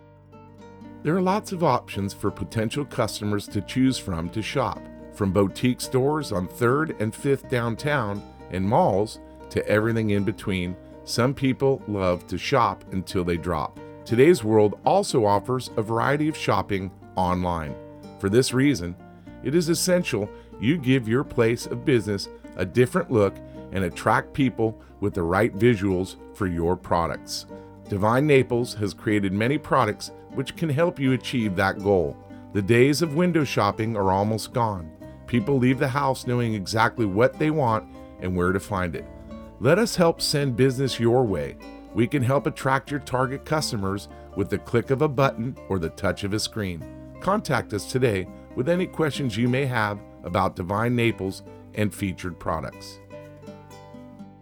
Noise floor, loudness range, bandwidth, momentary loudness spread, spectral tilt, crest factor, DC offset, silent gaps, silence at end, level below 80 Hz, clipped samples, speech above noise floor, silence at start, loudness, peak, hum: -48 dBFS; 4 LU; 19.5 kHz; 13 LU; -6 dB/octave; 20 dB; under 0.1%; none; 0.1 s; -50 dBFS; under 0.1%; 25 dB; 0.3 s; -24 LUFS; -4 dBFS; none